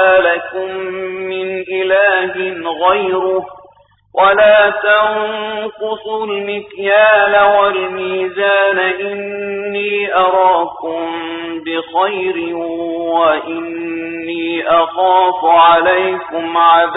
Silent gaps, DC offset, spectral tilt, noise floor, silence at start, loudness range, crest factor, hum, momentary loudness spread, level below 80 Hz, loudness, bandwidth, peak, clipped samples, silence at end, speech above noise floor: none; under 0.1%; -8.5 dB/octave; -47 dBFS; 0 s; 4 LU; 14 dB; none; 13 LU; -56 dBFS; -14 LUFS; 4 kHz; 0 dBFS; under 0.1%; 0 s; 34 dB